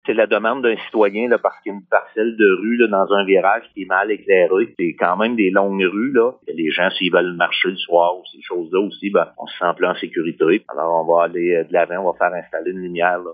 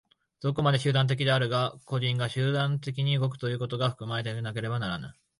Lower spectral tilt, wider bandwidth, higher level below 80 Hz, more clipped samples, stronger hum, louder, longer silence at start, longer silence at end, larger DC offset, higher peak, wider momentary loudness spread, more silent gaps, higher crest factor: first, -8.5 dB/octave vs -6.5 dB/octave; second, 4.9 kHz vs 11 kHz; second, -70 dBFS vs -62 dBFS; neither; neither; first, -18 LUFS vs -28 LUFS; second, 0.05 s vs 0.4 s; second, 0 s vs 0.25 s; neither; first, 0 dBFS vs -12 dBFS; about the same, 7 LU vs 8 LU; neither; about the same, 18 dB vs 16 dB